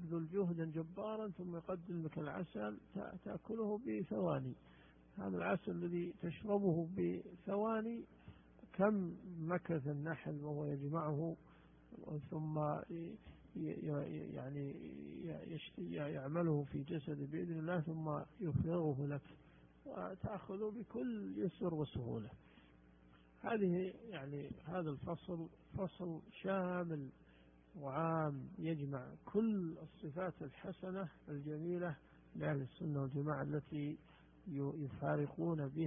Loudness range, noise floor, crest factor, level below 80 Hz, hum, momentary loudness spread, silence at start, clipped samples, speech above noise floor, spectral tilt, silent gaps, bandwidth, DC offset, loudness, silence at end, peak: 4 LU; -66 dBFS; 22 dB; -68 dBFS; none; 11 LU; 0 s; under 0.1%; 24 dB; -6.5 dB/octave; none; 3.6 kHz; under 0.1%; -43 LUFS; 0 s; -20 dBFS